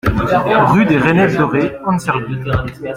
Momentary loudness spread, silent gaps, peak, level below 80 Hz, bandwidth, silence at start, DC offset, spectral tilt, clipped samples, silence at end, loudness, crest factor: 8 LU; none; 0 dBFS; -32 dBFS; 16 kHz; 0.05 s; under 0.1%; -7.5 dB/octave; under 0.1%; 0 s; -14 LUFS; 14 dB